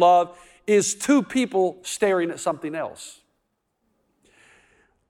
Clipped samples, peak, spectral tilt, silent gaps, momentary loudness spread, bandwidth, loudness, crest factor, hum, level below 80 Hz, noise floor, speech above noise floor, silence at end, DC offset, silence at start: under 0.1%; -6 dBFS; -4 dB/octave; none; 14 LU; 17 kHz; -23 LUFS; 18 dB; none; -68 dBFS; -74 dBFS; 53 dB; 2 s; under 0.1%; 0 s